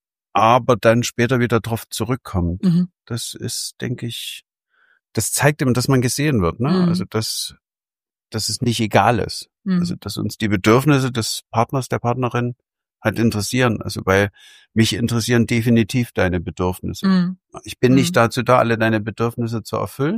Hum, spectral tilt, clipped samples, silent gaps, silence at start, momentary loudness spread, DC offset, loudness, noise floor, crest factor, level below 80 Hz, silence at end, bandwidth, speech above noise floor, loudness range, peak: none; -5.5 dB/octave; under 0.1%; none; 0.35 s; 11 LU; under 0.1%; -19 LUFS; under -90 dBFS; 18 dB; -46 dBFS; 0 s; 15.5 kHz; over 72 dB; 3 LU; 0 dBFS